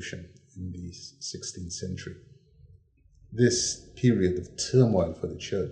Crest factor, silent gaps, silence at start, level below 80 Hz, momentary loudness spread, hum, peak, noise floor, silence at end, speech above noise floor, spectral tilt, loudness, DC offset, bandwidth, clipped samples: 20 dB; none; 0 s; -56 dBFS; 18 LU; none; -8 dBFS; -59 dBFS; 0 s; 31 dB; -5 dB/octave; -27 LUFS; under 0.1%; 9.8 kHz; under 0.1%